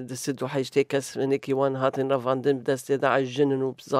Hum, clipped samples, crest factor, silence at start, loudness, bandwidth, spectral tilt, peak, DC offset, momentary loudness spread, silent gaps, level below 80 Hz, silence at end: none; under 0.1%; 18 dB; 0 s; -25 LUFS; 15 kHz; -5.5 dB/octave; -8 dBFS; under 0.1%; 5 LU; none; -74 dBFS; 0 s